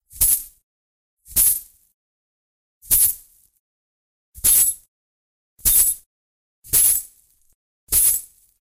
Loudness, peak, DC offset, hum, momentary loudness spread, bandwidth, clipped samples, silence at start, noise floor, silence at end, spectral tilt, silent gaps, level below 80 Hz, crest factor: -16 LUFS; -2 dBFS; under 0.1%; none; 10 LU; 16.5 kHz; under 0.1%; 0.15 s; -52 dBFS; 0.35 s; 0.5 dB/octave; 0.63-1.17 s, 1.94-2.81 s, 3.59-4.32 s, 4.88-5.57 s, 6.06-6.62 s, 7.54-7.87 s; -42 dBFS; 20 dB